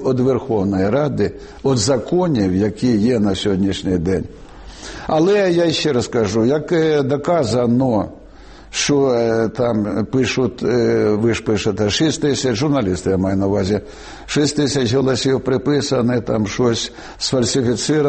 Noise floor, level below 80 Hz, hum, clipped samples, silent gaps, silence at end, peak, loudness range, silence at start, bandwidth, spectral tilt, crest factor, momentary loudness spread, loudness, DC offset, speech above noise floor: -39 dBFS; -42 dBFS; none; under 0.1%; none; 0 s; -6 dBFS; 1 LU; 0 s; 8.8 kHz; -5.5 dB/octave; 12 dB; 6 LU; -17 LUFS; under 0.1%; 23 dB